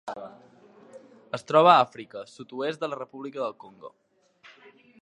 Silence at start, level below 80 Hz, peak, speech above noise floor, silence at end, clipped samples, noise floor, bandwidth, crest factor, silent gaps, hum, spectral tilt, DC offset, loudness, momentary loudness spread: 0.05 s; -80 dBFS; -4 dBFS; 31 dB; 1.15 s; under 0.1%; -56 dBFS; 11 kHz; 24 dB; none; none; -5.5 dB/octave; under 0.1%; -24 LUFS; 24 LU